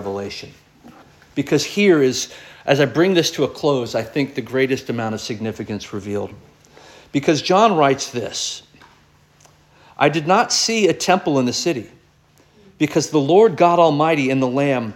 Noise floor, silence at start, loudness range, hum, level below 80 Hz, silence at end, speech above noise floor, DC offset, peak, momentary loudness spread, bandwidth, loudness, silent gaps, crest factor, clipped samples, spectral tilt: -54 dBFS; 0 s; 5 LU; none; -58 dBFS; 0 s; 36 dB; under 0.1%; -2 dBFS; 14 LU; 17 kHz; -18 LUFS; none; 18 dB; under 0.1%; -4.5 dB/octave